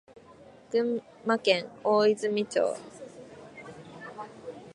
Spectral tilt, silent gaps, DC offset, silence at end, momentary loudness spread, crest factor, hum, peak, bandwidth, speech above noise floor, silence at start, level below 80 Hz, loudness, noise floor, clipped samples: -4.5 dB/octave; none; under 0.1%; 0 s; 22 LU; 22 dB; none; -8 dBFS; 11 kHz; 26 dB; 0.7 s; -74 dBFS; -27 LUFS; -53 dBFS; under 0.1%